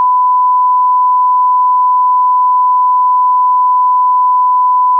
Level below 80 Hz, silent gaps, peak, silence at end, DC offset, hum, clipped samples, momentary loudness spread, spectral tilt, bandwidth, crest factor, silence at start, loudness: under -90 dBFS; none; -6 dBFS; 0 s; under 0.1%; none; under 0.1%; 0 LU; 8.5 dB/octave; 1.2 kHz; 4 dB; 0 s; -9 LUFS